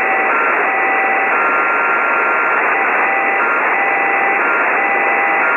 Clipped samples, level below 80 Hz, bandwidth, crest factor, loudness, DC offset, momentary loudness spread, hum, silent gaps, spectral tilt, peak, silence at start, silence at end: under 0.1%; -68 dBFS; 15 kHz; 12 dB; -13 LUFS; under 0.1%; 0 LU; none; none; -4.5 dB/octave; -2 dBFS; 0 s; 0 s